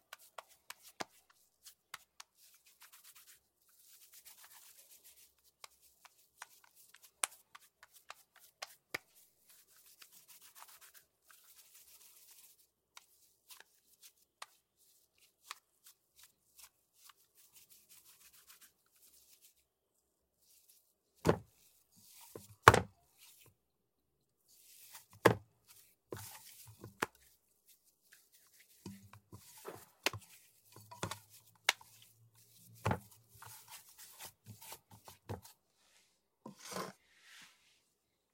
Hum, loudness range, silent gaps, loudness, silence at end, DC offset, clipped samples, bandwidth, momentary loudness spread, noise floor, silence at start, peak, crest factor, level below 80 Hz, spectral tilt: none; 25 LU; none; -38 LUFS; 1.4 s; under 0.1%; under 0.1%; 16.5 kHz; 26 LU; -84 dBFS; 1 s; 0 dBFS; 44 dB; -68 dBFS; -3.5 dB/octave